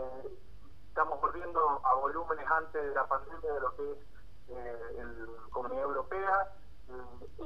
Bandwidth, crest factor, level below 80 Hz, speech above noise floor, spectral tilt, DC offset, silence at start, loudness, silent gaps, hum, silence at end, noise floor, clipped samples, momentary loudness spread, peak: 12.5 kHz; 20 dB; -56 dBFS; 20 dB; -7 dB/octave; 0.8%; 0 s; -34 LUFS; none; none; 0 s; -55 dBFS; under 0.1%; 18 LU; -14 dBFS